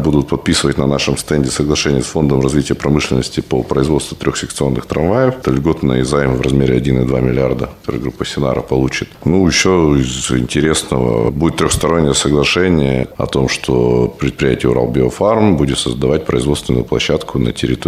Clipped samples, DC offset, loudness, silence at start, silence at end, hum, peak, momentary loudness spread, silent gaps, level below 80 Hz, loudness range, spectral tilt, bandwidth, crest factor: under 0.1%; under 0.1%; -14 LUFS; 0 s; 0 s; none; 0 dBFS; 6 LU; none; -30 dBFS; 2 LU; -5.5 dB/octave; 15 kHz; 14 dB